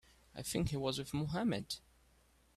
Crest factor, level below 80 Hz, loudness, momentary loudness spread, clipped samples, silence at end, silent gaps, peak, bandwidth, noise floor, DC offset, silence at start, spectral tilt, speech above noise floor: 18 dB; -58 dBFS; -39 LUFS; 9 LU; under 0.1%; 0.8 s; none; -22 dBFS; 14.5 kHz; -69 dBFS; under 0.1%; 0.35 s; -5 dB/octave; 32 dB